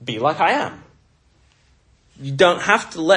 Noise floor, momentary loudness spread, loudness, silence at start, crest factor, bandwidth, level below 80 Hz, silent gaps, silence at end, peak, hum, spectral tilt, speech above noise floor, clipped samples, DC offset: -57 dBFS; 14 LU; -18 LUFS; 0 s; 20 dB; 11 kHz; -60 dBFS; none; 0 s; 0 dBFS; none; -4.5 dB/octave; 40 dB; under 0.1%; under 0.1%